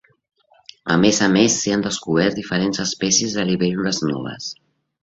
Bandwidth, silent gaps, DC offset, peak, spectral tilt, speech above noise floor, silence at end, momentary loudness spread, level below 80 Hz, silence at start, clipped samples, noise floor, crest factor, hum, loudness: 8 kHz; none; under 0.1%; -2 dBFS; -3.5 dB/octave; 29 dB; 0.5 s; 12 LU; -54 dBFS; 0.85 s; under 0.1%; -48 dBFS; 18 dB; none; -19 LUFS